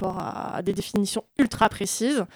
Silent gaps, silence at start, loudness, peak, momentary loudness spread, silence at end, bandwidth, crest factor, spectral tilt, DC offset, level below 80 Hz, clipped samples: none; 0 s; -25 LUFS; -8 dBFS; 8 LU; 0.1 s; over 20 kHz; 18 dB; -4 dB/octave; under 0.1%; -52 dBFS; under 0.1%